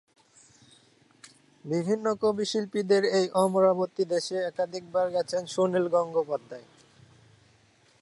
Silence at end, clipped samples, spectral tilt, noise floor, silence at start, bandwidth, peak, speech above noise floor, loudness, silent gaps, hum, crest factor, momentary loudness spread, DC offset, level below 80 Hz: 1.4 s; under 0.1%; -5 dB/octave; -62 dBFS; 1.65 s; 11.5 kHz; -10 dBFS; 36 dB; -27 LUFS; none; none; 18 dB; 9 LU; under 0.1%; -76 dBFS